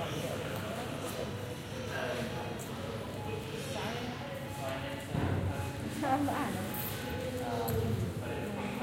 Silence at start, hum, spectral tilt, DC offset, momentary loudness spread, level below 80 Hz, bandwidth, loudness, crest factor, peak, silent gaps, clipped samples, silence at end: 0 s; none; -5.5 dB/octave; under 0.1%; 6 LU; -54 dBFS; 16.5 kHz; -37 LUFS; 16 dB; -20 dBFS; none; under 0.1%; 0 s